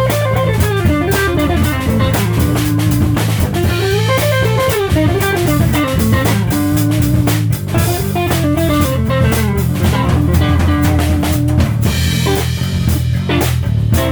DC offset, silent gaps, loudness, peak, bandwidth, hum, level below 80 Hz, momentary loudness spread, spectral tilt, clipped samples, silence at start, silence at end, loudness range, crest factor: under 0.1%; none; -14 LUFS; -2 dBFS; over 20 kHz; none; -24 dBFS; 2 LU; -6 dB/octave; under 0.1%; 0 s; 0 s; 1 LU; 12 dB